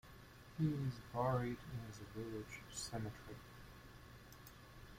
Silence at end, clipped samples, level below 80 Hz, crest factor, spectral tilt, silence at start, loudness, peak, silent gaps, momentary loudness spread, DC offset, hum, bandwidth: 0 s; under 0.1%; -64 dBFS; 20 dB; -6 dB/octave; 0.05 s; -44 LUFS; -26 dBFS; none; 19 LU; under 0.1%; none; 16.5 kHz